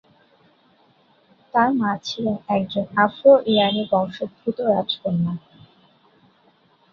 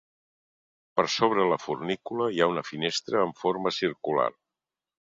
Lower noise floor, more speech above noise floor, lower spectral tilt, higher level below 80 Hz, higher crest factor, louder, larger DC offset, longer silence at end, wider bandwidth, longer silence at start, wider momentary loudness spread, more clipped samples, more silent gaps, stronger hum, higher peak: second, -59 dBFS vs -89 dBFS; second, 39 dB vs 63 dB; first, -6.5 dB/octave vs -4.5 dB/octave; about the same, -64 dBFS vs -68 dBFS; about the same, 20 dB vs 22 dB; first, -20 LUFS vs -27 LUFS; neither; first, 1.55 s vs 0.85 s; second, 7 kHz vs 7.8 kHz; first, 1.55 s vs 0.95 s; first, 12 LU vs 7 LU; neither; neither; neither; first, -2 dBFS vs -6 dBFS